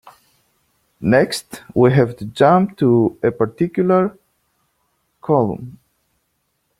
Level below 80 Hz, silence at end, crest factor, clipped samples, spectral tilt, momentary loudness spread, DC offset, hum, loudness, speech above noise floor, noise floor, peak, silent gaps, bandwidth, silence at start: -54 dBFS; 1.1 s; 16 dB; under 0.1%; -7 dB/octave; 11 LU; under 0.1%; none; -17 LUFS; 53 dB; -69 dBFS; -2 dBFS; none; 15.5 kHz; 1 s